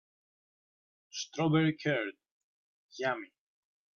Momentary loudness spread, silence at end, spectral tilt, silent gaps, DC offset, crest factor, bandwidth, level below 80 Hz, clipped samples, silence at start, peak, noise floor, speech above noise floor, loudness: 17 LU; 0.7 s; -5.5 dB/octave; 2.31-2.89 s; under 0.1%; 18 dB; 7 kHz; -78 dBFS; under 0.1%; 1.15 s; -18 dBFS; under -90 dBFS; over 59 dB; -33 LUFS